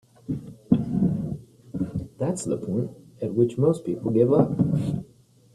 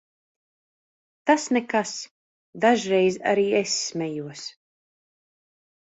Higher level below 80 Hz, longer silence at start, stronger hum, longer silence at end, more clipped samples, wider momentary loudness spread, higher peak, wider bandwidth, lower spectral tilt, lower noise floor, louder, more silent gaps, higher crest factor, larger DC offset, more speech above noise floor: first, -52 dBFS vs -70 dBFS; second, 0.3 s vs 1.25 s; neither; second, 0.5 s vs 1.45 s; neither; about the same, 14 LU vs 15 LU; about the same, -6 dBFS vs -4 dBFS; first, 12 kHz vs 8.2 kHz; first, -8.5 dB/octave vs -3.5 dB/octave; second, -55 dBFS vs under -90 dBFS; about the same, -25 LUFS vs -23 LUFS; second, none vs 2.11-2.53 s; about the same, 20 dB vs 22 dB; neither; second, 33 dB vs over 67 dB